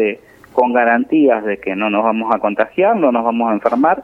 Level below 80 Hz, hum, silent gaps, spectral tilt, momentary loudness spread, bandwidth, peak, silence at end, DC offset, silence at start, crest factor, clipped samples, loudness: -58 dBFS; none; none; -8 dB/octave; 6 LU; 5.6 kHz; 0 dBFS; 0 s; under 0.1%; 0 s; 14 dB; under 0.1%; -15 LUFS